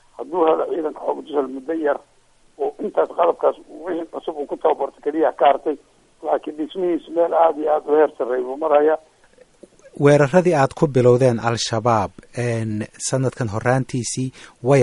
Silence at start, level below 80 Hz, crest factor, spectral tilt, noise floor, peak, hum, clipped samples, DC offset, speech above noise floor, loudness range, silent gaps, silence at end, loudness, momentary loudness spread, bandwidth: 0.2 s; -56 dBFS; 18 dB; -6 dB/octave; -52 dBFS; -2 dBFS; none; under 0.1%; under 0.1%; 33 dB; 5 LU; none; 0 s; -20 LUFS; 12 LU; 11.5 kHz